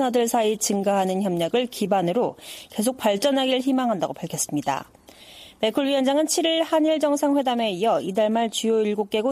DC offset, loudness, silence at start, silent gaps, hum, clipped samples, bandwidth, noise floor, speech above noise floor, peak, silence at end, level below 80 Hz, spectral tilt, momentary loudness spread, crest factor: under 0.1%; -23 LUFS; 0 s; none; none; under 0.1%; 15.5 kHz; -46 dBFS; 24 dB; -8 dBFS; 0 s; -66 dBFS; -4 dB/octave; 6 LU; 14 dB